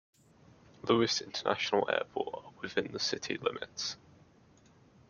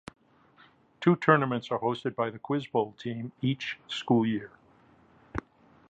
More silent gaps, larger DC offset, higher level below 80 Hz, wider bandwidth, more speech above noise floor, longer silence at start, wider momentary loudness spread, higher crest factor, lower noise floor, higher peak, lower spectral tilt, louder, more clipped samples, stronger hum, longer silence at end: neither; neither; second, -72 dBFS vs -60 dBFS; second, 7.4 kHz vs 8.6 kHz; about the same, 29 dB vs 32 dB; second, 0.85 s vs 1 s; second, 10 LU vs 16 LU; about the same, 22 dB vs 26 dB; about the same, -62 dBFS vs -60 dBFS; second, -12 dBFS vs -4 dBFS; second, -3.5 dB/octave vs -7 dB/octave; second, -33 LUFS vs -29 LUFS; neither; neither; first, 1.15 s vs 0.5 s